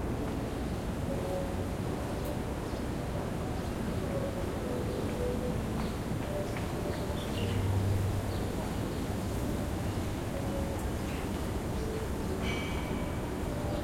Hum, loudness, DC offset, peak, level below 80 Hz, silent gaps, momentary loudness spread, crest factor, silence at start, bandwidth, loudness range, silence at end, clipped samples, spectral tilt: none; -34 LUFS; under 0.1%; -20 dBFS; -42 dBFS; none; 3 LU; 14 dB; 0 s; 16.5 kHz; 2 LU; 0 s; under 0.1%; -6.5 dB/octave